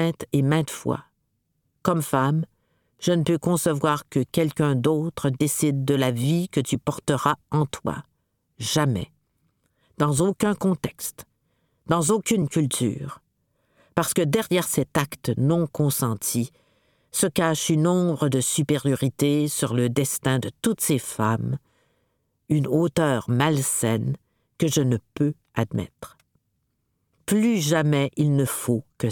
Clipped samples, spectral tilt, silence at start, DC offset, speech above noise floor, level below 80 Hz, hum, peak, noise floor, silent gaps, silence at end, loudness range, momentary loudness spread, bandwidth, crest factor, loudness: under 0.1%; -5.5 dB/octave; 0 s; under 0.1%; 51 dB; -56 dBFS; none; -4 dBFS; -74 dBFS; none; 0 s; 3 LU; 8 LU; 19 kHz; 20 dB; -23 LUFS